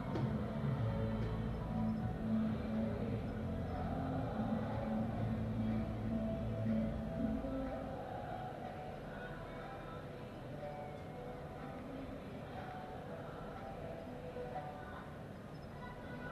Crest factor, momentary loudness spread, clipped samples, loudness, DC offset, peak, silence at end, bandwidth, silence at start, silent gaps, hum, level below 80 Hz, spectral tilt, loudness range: 14 dB; 10 LU; under 0.1%; -42 LUFS; under 0.1%; -26 dBFS; 0 s; 13 kHz; 0 s; none; none; -52 dBFS; -8.5 dB/octave; 8 LU